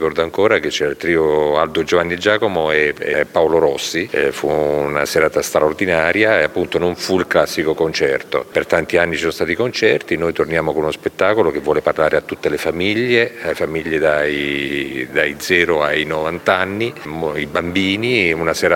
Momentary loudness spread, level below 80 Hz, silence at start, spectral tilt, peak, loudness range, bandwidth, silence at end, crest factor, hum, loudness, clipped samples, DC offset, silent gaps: 5 LU; -46 dBFS; 0 s; -4.5 dB/octave; 0 dBFS; 2 LU; 17 kHz; 0 s; 16 dB; none; -17 LUFS; under 0.1%; under 0.1%; none